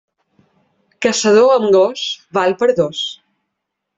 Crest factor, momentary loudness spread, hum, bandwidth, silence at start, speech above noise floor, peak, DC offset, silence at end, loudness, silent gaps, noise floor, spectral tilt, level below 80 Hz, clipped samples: 14 dB; 11 LU; none; 8.2 kHz; 1 s; 63 dB; -2 dBFS; under 0.1%; 0.85 s; -15 LUFS; none; -76 dBFS; -3.5 dB/octave; -60 dBFS; under 0.1%